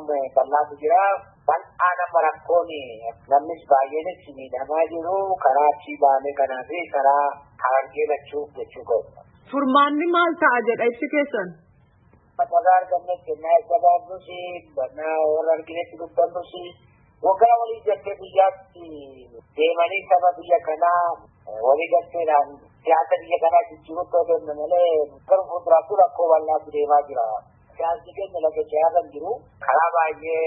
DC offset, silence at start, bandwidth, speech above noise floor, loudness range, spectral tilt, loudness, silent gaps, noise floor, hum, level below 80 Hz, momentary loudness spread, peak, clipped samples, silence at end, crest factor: under 0.1%; 0 s; 4 kHz; 35 dB; 3 LU; -9 dB/octave; -21 LUFS; none; -56 dBFS; none; -64 dBFS; 14 LU; -4 dBFS; under 0.1%; 0 s; 18 dB